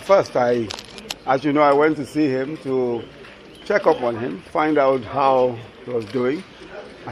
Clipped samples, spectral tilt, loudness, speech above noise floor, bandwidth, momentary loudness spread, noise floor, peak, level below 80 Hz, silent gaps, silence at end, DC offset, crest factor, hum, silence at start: under 0.1%; -6 dB/octave; -20 LUFS; 22 dB; 13.5 kHz; 20 LU; -41 dBFS; -2 dBFS; -56 dBFS; none; 0 s; under 0.1%; 20 dB; none; 0 s